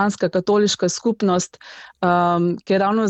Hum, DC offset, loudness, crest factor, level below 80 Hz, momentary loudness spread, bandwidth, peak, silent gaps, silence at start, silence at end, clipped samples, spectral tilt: none; under 0.1%; -19 LUFS; 14 dB; -60 dBFS; 9 LU; 8.6 kHz; -4 dBFS; none; 0 s; 0 s; under 0.1%; -5 dB/octave